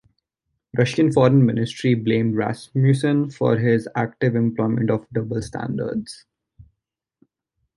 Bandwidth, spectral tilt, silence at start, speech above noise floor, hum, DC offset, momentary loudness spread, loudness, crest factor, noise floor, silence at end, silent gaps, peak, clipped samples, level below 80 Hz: 11.5 kHz; -7.5 dB/octave; 0.75 s; 62 dB; none; under 0.1%; 11 LU; -21 LUFS; 18 dB; -81 dBFS; 1.15 s; none; -2 dBFS; under 0.1%; -54 dBFS